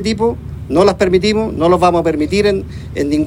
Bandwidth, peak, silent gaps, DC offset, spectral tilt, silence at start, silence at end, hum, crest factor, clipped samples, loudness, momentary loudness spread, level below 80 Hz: 15.5 kHz; 0 dBFS; none; under 0.1%; -6 dB/octave; 0 s; 0 s; none; 14 dB; under 0.1%; -14 LUFS; 9 LU; -34 dBFS